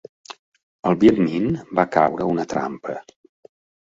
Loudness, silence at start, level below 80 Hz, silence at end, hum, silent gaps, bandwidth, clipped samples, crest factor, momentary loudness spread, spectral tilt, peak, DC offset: -20 LUFS; 0.3 s; -52 dBFS; 0.85 s; none; 0.39-0.52 s, 0.63-0.83 s; 7.8 kHz; under 0.1%; 20 dB; 24 LU; -7.5 dB/octave; -2 dBFS; under 0.1%